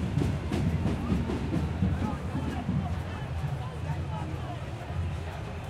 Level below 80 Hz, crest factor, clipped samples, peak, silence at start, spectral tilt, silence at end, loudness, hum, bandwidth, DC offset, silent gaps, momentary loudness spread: -42 dBFS; 16 dB; under 0.1%; -14 dBFS; 0 s; -7.5 dB/octave; 0 s; -32 LUFS; none; 13 kHz; under 0.1%; none; 7 LU